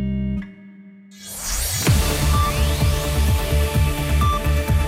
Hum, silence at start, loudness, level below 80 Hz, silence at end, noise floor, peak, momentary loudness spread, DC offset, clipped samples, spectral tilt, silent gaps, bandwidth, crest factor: none; 0 s; -20 LUFS; -22 dBFS; 0 s; -43 dBFS; -6 dBFS; 10 LU; under 0.1%; under 0.1%; -4.5 dB/octave; none; 16.5 kHz; 12 dB